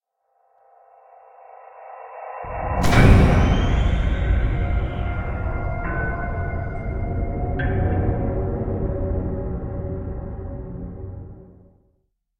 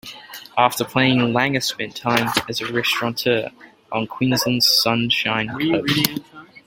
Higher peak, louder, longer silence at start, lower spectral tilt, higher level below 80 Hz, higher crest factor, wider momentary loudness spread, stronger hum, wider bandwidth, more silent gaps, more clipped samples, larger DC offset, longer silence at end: about the same, -2 dBFS vs 0 dBFS; second, -23 LUFS vs -19 LUFS; first, 1.5 s vs 0.05 s; first, -7.5 dB/octave vs -4 dB/octave; first, -26 dBFS vs -56 dBFS; about the same, 20 dB vs 20 dB; first, 18 LU vs 10 LU; neither; about the same, 15.5 kHz vs 17 kHz; neither; neither; neither; first, 0.9 s vs 0.1 s